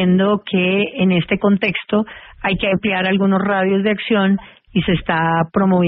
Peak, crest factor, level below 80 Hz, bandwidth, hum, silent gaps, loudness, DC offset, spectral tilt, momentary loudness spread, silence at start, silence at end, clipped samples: -4 dBFS; 14 dB; -44 dBFS; 4.1 kHz; none; none; -17 LUFS; under 0.1%; -5 dB/octave; 5 LU; 0 s; 0 s; under 0.1%